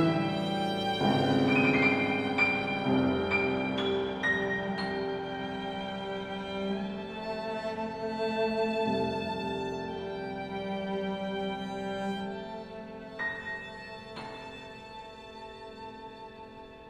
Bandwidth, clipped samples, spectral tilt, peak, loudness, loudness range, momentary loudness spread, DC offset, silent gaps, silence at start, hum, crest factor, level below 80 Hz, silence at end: 12 kHz; under 0.1%; -6.5 dB/octave; -14 dBFS; -31 LUFS; 13 LU; 18 LU; under 0.1%; none; 0 s; none; 18 dB; -60 dBFS; 0 s